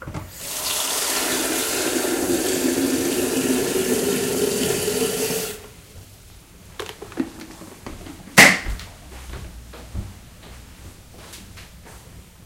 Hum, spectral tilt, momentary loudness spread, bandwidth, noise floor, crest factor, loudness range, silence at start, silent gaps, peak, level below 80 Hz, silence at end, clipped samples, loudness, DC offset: none; -2.5 dB/octave; 20 LU; 16 kHz; -45 dBFS; 24 dB; 13 LU; 0 s; none; 0 dBFS; -42 dBFS; 0.05 s; under 0.1%; -20 LUFS; under 0.1%